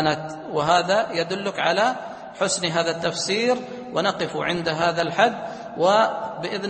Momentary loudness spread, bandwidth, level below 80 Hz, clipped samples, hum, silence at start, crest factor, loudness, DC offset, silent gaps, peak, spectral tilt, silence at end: 9 LU; 8.8 kHz; -60 dBFS; under 0.1%; none; 0 s; 20 dB; -22 LUFS; under 0.1%; none; -4 dBFS; -3.5 dB/octave; 0 s